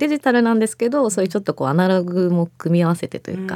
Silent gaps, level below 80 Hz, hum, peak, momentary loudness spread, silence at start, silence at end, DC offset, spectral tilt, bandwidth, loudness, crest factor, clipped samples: none; -68 dBFS; none; -4 dBFS; 6 LU; 0 s; 0 s; under 0.1%; -6.5 dB/octave; 14.5 kHz; -19 LUFS; 16 dB; under 0.1%